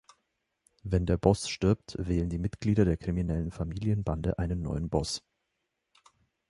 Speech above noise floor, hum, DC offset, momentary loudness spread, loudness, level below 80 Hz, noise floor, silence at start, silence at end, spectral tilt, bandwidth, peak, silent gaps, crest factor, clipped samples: 53 dB; none; under 0.1%; 7 LU; -30 LUFS; -42 dBFS; -82 dBFS; 0.85 s; 1.3 s; -6.5 dB/octave; 11.5 kHz; -8 dBFS; none; 24 dB; under 0.1%